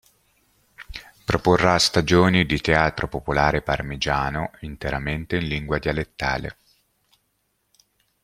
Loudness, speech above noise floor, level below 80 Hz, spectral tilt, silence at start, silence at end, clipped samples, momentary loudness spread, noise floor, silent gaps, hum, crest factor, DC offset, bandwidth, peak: -22 LUFS; 50 dB; -40 dBFS; -5 dB/octave; 0.8 s; 1.7 s; under 0.1%; 14 LU; -71 dBFS; none; none; 22 dB; under 0.1%; 15.5 kHz; 0 dBFS